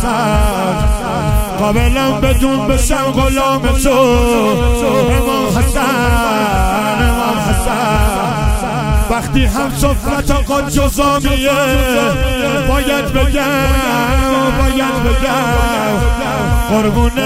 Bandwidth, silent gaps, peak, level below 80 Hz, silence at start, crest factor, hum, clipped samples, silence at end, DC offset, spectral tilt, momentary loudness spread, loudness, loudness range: 16.5 kHz; none; 0 dBFS; -18 dBFS; 0 s; 12 dB; none; under 0.1%; 0 s; under 0.1%; -5 dB/octave; 3 LU; -13 LUFS; 2 LU